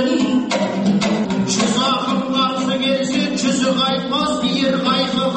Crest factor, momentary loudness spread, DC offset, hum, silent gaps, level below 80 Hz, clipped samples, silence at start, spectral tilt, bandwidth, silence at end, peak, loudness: 12 dB; 2 LU; under 0.1%; none; none; -52 dBFS; under 0.1%; 0 s; -4.5 dB/octave; 8.8 kHz; 0 s; -6 dBFS; -17 LUFS